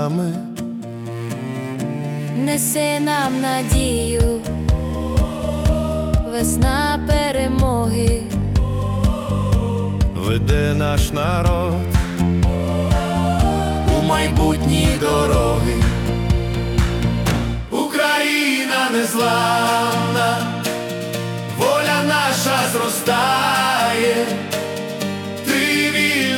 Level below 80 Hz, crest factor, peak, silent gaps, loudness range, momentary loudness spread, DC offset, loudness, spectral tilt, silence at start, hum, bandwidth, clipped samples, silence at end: -26 dBFS; 14 dB; -4 dBFS; none; 2 LU; 8 LU; under 0.1%; -18 LUFS; -5 dB/octave; 0 s; none; 18 kHz; under 0.1%; 0 s